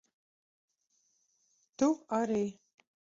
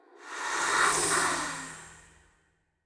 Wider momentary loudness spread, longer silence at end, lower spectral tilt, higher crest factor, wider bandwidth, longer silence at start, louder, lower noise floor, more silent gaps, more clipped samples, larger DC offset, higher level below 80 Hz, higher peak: second, 5 LU vs 18 LU; second, 0.65 s vs 0.85 s; first, -6 dB/octave vs -0.5 dB/octave; about the same, 18 dB vs 20 dB; second, 7.8 kHz vs 11 kHz; first, 1.8 s vs 0.2 s; second, -32 LUFS vs -27 LUFS; first, -76 dBFS vs -71 dBFS; neither; neither; neither; second, -76 dBFS vs -62 dBFS; second, -18 dBFS vs -12 dBFS